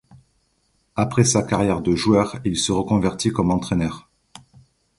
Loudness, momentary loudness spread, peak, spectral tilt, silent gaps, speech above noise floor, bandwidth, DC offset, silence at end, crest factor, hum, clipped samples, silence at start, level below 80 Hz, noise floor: -20 LUFS; 7 LU; -2 dBFS; -5 dB/octave; none; 46 dB; 11.5 kHz; under 0.1%; 1 s; 20 dB; none; under 0.1%; 0.95 s; -44 dBFS; -66 dBFS